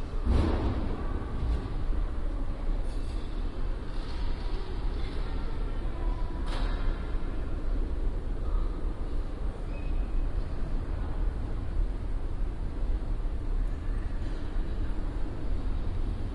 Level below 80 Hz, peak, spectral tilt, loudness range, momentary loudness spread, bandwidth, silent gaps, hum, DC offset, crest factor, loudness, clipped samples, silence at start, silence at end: -30 dBFS; -14 dBFS; -7.5 dB/octave; 1 LU; 4 LU; 5.6 kHz; none; none; under 0.1%; 14 dB; -35 LUFS; under 0.1%; 0 s; 0 s